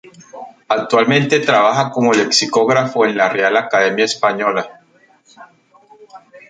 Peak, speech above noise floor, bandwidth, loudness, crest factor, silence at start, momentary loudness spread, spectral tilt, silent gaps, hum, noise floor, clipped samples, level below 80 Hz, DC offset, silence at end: 0 dBFS; 38 dB; 9.4 kHz; -14 LUFS; 16 dB; 0.35 s; 9 LU; -4 dB/octave; none; none; -52 dBFS; under 0.1%; -64 dBFS; under 0.1%; 0.1 s